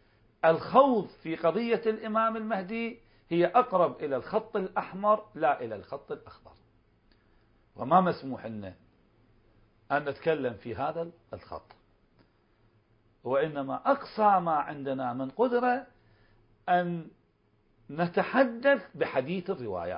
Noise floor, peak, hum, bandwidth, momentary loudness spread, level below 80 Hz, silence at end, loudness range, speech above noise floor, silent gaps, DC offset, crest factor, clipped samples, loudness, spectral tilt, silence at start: -68 dBFS; -8 dBFS; none; 5.4 kHz; 16 LU; -66 dBFS; 0 s; 7 LU; 40 dB; none; under 0.1%; 22 dB; under 0.1%; -29 LUFS; -10 dB/octave; 0.45 s